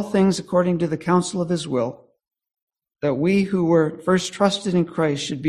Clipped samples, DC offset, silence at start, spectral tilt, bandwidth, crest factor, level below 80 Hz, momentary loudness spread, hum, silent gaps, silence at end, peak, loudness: under 0.1%; under 0.1%; 0 s; -6 dB/octave; 12 kHz; 18 dB; -56 dBFS; 6 LU; none; 2.62-2.67 s; 0 s; -2 dBFS; -21 LUFS